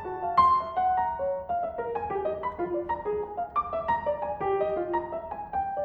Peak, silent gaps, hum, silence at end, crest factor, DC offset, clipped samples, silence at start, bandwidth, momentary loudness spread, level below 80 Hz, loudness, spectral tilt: -10 dBFS; none; none; 0 s; 18 dB; under 0.1%; under 0.1%; 0 s; 5.8 kHz; 9 LU; -54 dBFS; -28 LUFS; -8 dB/octave